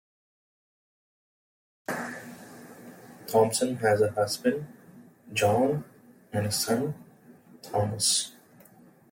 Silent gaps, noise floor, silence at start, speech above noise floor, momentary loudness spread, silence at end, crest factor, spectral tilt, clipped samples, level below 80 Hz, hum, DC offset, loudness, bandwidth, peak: none; -56 dBFS; 1.9 s; 30 dB; 22 LU; 0.8 s; 20 dB; -4 dB/octave; under 0.1%; -68 dBFS; none; under 0.1%; -27 LUFS; 16.5 kHz; -10 dBFS